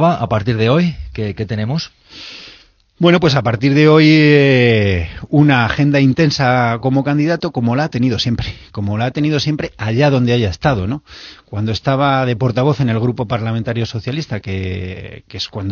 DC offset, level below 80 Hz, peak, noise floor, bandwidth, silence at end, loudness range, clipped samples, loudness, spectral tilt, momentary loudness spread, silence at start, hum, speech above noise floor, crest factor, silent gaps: under 0.1%; -40 dBFS; 0 dBFS; -46 dBFS; 7 kHz; 0 s; 6 LU; under 0.1%; -15 LUFS; -5.5 dB/octave; 15 LU; 0 s; none; 32 dB; 14 dB; none